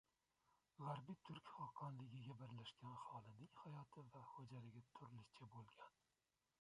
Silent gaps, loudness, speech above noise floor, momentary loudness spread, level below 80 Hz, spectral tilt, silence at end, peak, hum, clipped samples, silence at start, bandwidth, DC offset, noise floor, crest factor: none; -59 LUFS; 28 dB; 9 LU; -88 dBFS; -7 dB/octave; 0.7 s; -38 dBFS; none; under 0.1%; 0.8 s; 11 kHz; under 0.1%; -86 dBFS; 20 dB